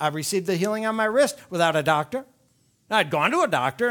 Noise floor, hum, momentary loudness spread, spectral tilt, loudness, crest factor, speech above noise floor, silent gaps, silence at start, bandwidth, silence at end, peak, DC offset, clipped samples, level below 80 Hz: -64 dBFS; none; 4 LU; -4 dB/octave; -23 LUFS; 18 dB; 41 dB; none; 0 s; 19.5 kHz; 0 s; -4 dBFS; under 0.1%; under 0.1%; -68 dBFS